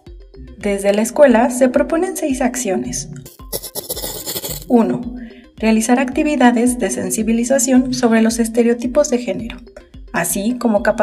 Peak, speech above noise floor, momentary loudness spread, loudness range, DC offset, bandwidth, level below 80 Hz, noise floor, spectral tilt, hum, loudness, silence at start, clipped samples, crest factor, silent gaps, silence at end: 0 dBFS; 21 dB; 12 LU; 5 LU; under 0.1%; 16 kHz; -40 dBFS; -36 dBFS; -4 dB/octave; none; -16 LUFS; 0.05 s; under 0.1%; 16 dB; none; 0 s